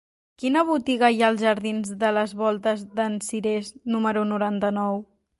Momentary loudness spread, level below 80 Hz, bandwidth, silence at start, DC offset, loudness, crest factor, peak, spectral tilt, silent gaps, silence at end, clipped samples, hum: 8 LU; -66 dBFS; 11.5 kHz; 0.4 s; under 0.1%; -24 LUFS; 18 dB; -4 dBFS; -5 dB/octave; none; 0.35 s; under 0.1%; none